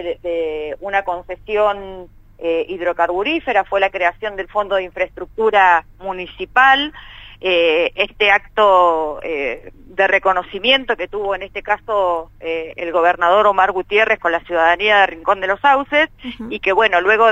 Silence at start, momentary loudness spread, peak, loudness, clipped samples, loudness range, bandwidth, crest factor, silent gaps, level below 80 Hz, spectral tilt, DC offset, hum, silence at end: 0 s; 13 LU; 0 dBFS; -16 LUFS; under 0.1%; 4 LU; 8.8 kHz; 16 dB; none; -44 dBFS; -4 dB/octave; under 0.1%; none; 0 s